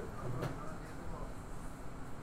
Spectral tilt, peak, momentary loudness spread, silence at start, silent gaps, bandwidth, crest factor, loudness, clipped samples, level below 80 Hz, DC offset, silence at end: -6.5 dB/octave; -26 dBFS; 8 LU; 0 s; none; 16 kHz; 16 dB; -45 LUFS; under 0.1%; -48 dBFS; under 0.1%; 0 s